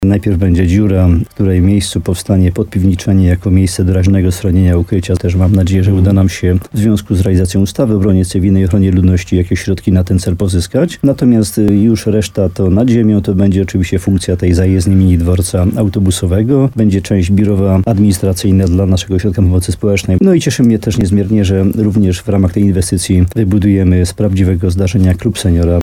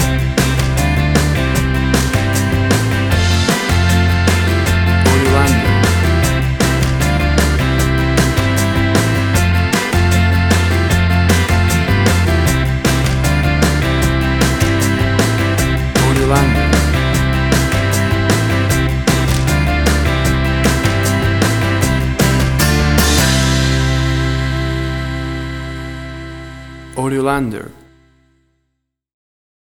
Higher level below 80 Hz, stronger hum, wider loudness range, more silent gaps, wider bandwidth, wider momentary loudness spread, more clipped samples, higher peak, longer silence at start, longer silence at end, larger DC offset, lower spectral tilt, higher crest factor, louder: second, -28 dBFS vs -22 dBFS; neither; second, 1 LU vs 7 LU; neither; second, 14.5 kHz vs 19.5 kHz; about the same, 4 LU vs 5 LU; neither; about the same, 0 dBFS vs 0 dBFS; about the same, 0 s vs 0 s; second, 0 s vs 1.9 s; neither; first, -7 dB/octave vs -5 dB/octave; about the same, 10 dB vs 14 dB; first, -11 LUFS vs -14 LUFS